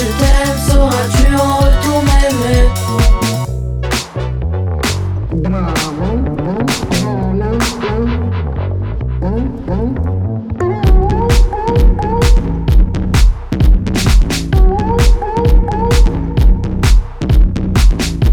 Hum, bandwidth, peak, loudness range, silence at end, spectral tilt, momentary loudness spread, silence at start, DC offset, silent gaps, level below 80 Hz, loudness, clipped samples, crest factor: none; 17 kHz; 0 dBFS; 4 LU; 0 s; -6 dB/octave; 6 LU; 0 s; under 0.1%; none; -14 dBFS; -14 LUFS; under 0.1%; 10 dB